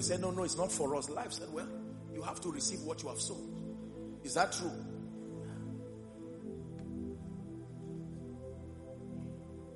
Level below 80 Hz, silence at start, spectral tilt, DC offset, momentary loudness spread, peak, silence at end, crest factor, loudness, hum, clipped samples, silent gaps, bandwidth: -62 dBFS; 0 s; -4 dB/octave; under 0.1%; 13 LU; -16 dBFS; 0 s; 24 dB; -40 LUFS; none; under 0.1%; none; 11.5 kHz